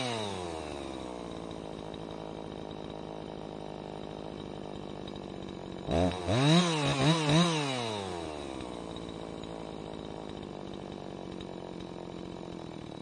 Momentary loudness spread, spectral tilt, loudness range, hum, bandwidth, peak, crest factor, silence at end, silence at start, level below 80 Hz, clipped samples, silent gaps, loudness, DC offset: 16 LU; -5 dB/octave; 13 LU; none; 11.5 kHz; -12 dBFS; 22 dB; 0 s; 0 s; -56 dBFS; under 0.1%; none; -34 LUFS; under 0.1%